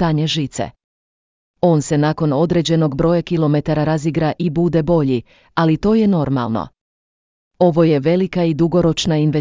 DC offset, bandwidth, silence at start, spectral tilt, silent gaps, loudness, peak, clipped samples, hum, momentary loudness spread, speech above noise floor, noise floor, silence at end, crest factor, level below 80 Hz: under 0.1%; 7.6 kHz; 0 s; -7 dB/octave; 0.84-1.54 s, 6.81-7.51 s; -17 LUFS; -2 dBFS; under 0.1%; none; 6 LU; over 74 dB; under -90 dBFS; 0 s; 14 dB; -42 dBFS